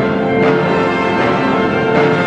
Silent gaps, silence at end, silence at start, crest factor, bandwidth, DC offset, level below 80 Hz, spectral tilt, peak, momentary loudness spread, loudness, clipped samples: none; 0 s; 0 s; 12 dB; 9.4 kHz; under 0.1%; -42 dBFS; -7 dB/octave; -2 dBFS; 2 LU; -13 LUFS; under 0.1%